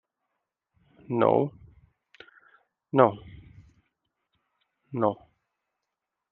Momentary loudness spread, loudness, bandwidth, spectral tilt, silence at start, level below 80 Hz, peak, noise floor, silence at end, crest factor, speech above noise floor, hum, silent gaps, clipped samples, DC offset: 17 LU; -26 LUFS; 4.3 kHz; -7 dB/octave; 1.1 s; -66 dBFS; -4 dBFS; -85 dBFS; 1.2 s; 28 dB; 62 dB; none; none; under 0.1%; under 0.1%